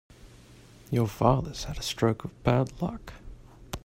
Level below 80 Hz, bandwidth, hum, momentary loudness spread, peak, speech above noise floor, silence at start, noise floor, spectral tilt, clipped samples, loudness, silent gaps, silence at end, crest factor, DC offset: -46 dBFS; 16 kHz; none; 18 LU; -6 dBFS; 25 dB; 0.25 s; -52 dBFS; -6 dB/octave; under 0.1%; -28 LUFS; none; 0.05 s; 24 dB; under 0.1%